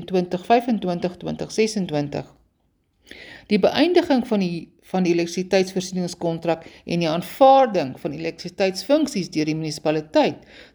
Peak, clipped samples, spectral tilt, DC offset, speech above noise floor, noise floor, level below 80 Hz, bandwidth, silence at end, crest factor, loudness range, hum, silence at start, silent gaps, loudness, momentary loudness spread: -2 dBFS; under 0.1%; -5.5 dB/octave; under 0.1%; 46 dB; -67 dBFS; -58 dBFS; over 20 kHz; 0.1 s; 20 dB; 4 LU; none; 0 s; none; -21 LUFS; 12 LU